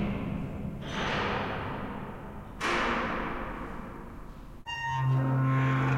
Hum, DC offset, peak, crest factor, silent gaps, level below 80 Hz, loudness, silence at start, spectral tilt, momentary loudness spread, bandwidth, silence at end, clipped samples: none; under 0.1%; -16 dBFS; 14 dB; none; -46 dBFS; -31 LUFS; 0 s; -6.5 dB/octave; 17 LU; 10.5 kHz; 0 s; under 0.1%